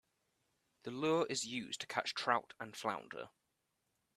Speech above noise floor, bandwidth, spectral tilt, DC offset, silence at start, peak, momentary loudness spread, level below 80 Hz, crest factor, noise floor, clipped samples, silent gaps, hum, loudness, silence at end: 45 dB; 14.5 kHz; -3 dB/octave; under 0.1%; 0.85 s; -16 dBFS; 15 LU; -82 dBFS; 26 dB; -84 dBFS; under 0.1%; none; none; -39 LUFS; 0.9 s